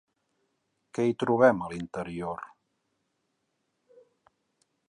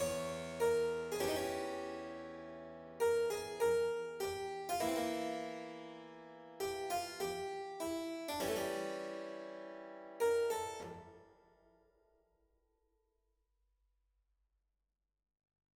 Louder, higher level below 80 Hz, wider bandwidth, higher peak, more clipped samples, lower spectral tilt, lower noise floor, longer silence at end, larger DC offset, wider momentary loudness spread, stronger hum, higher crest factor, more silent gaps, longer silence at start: first, -27 LUFS vs -39 LUFS; first, -64 dBFS vs -70 dBFS; second, 10.5 kHz vs over 20 kHz; first, -8 dBFS vs -24 dBFS; neither; first, -7 dB/octave vs -3.5 dB/octave; second, -78 dBFS vs -89 dBFS; second, 2.4 s vs 4.45 s; neither; about the same, 17 LU vs 16 LU; neither; first, 24 dB vs 18 dB; neither; first, 0.95 s vs 0 s